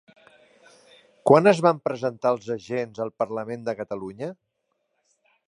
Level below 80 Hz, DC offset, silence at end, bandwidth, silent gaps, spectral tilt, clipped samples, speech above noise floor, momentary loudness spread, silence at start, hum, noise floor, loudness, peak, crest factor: -70 dBFS; under 0.1%; 1.15 s; 11 kHz; none; -6.5 dB/octave; under 0.1%; 53 dB; 16 LU; 1.25 s; none; -76 dBFS; -24 LUFS; -2 dBFS; 22 dB